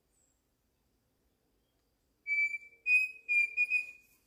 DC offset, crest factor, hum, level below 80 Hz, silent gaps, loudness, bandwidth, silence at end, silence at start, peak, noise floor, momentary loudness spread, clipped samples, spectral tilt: under 0.1%; 16 dB; none; -80 dBFS; none; -29 LUFS; 15.5 kHz; 0.35 s; 2.25 s; -20 dBFS; -77 dBFS; 11 LU; under 0.1%; 1 dB/octave